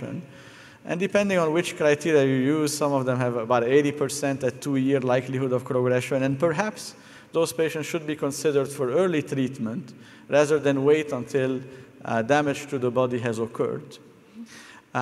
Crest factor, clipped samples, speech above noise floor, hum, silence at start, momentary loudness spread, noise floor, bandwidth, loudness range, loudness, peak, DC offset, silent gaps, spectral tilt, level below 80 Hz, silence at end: 20 dB; under 0.1%; 23 dB; none; 0 s; 15 LU; -47 dBFS; 14.5 kHz; 4 LU; -24 LUFS; -6 dBFS; under 0.1%; none; -5.5 dB/octave; -68 dBFS; 0 s